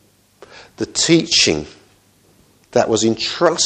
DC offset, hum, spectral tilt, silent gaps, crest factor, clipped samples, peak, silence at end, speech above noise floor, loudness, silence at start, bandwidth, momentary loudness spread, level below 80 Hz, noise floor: under 0.1%; none; -3 dB/octave; none; 18 dB; under 0.1%; 0 dBFS; 0 s; 38 dB; -16 LUFS; 0.55 s; 9.6 kHz; 12 LU; -50 dBFS; -54 dBFS